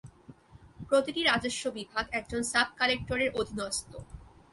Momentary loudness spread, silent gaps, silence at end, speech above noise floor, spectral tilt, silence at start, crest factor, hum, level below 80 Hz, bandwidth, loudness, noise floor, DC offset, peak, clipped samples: 9 LU; none; 0.3 s; 24 dB; -2.5 dB/octave; 0.05 s; 22 dB; none; -54 dBFS; 12 kHz; -29 LUFS; -54 dBFS; under 0.1%; -10 dBFS; under 0.1%